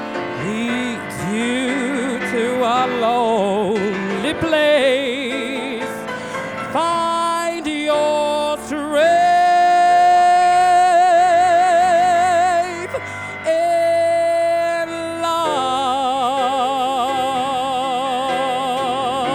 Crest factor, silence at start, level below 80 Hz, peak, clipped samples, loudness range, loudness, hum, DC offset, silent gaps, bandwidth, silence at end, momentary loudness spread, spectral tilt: 12 dB; 0 s; -56 dBFS; -6 dBFS; under 0.1%; 7 LU; -17 LUFS; none; under 0.1%; none; 14 kHz; 0 s; 11 LU; -4 dB/octave